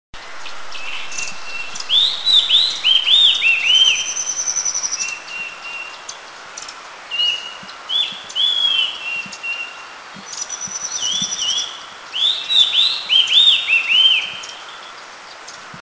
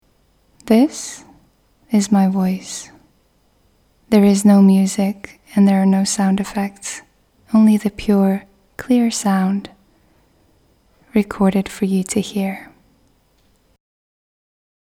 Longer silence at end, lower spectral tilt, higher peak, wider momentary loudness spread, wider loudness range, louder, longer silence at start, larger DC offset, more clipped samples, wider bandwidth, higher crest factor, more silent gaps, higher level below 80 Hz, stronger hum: second, 0 s vs 2.25 s; second, 2.5 dB/octave vs -6 dB/octave; about the same, -2 dBFS vs 0 dBFS; first, 22 LU vs 16 LU; first, 10 LU vs 7 LU; about the same, -14 LUFS vs -16 LUFS; second, 0.15 s vs 0.65 s; neither; neither; second, 8 kHz vs 14 kHz; about the same, 18 dB vs 18 dB; neither; second, -60 dBFS vs -50 dBFS; neither